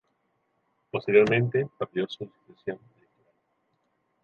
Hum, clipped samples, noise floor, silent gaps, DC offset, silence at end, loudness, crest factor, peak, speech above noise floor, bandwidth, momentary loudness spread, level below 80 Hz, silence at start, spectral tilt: none; under 0.1%; -74 dBFS; none; under 0.1%; 1.5 s; -25 LUFS; 22 dB; -6 dBFS; 48 dB; 7 kHz; 19 LU; -68 dBFS; 0.95 s; -7.5 dB/octave